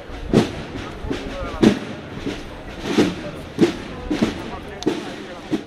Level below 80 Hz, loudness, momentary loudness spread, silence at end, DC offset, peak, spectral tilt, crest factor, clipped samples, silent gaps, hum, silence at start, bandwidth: -38 dBFS; -23 LUFS; 14 LU; 0 s; under 0.1%; 0 dBFS; -6 dB/octave; 22 dB; under 0.1%; none; none; 0 s; 13.5 kHz